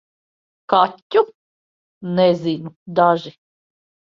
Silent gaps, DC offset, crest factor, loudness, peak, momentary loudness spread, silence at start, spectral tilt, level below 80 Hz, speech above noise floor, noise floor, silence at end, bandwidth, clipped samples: 1.02-1.10 s, 1.35-2.01 s, 2.76-2.86 s; under 0.1%; 20 dB; -19 LUFS; 0 dBFS; 11 LU; 0.7 s; -7.5 dB/octave; -66 dBFS; over 72 dB; under -90 dBFS; 0.85 s; 7.2 kHz; under 0.1%